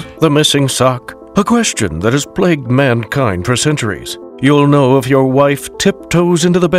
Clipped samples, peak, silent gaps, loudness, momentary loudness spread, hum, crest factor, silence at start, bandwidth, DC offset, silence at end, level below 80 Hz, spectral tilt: under 0.1%; 0 dBFS; none; -12 LUFS; 6 LU; none; 12 dB; 0 s; 16 kHz; under 0.1%; 0 s; -40 dBFS; -5 dB/octave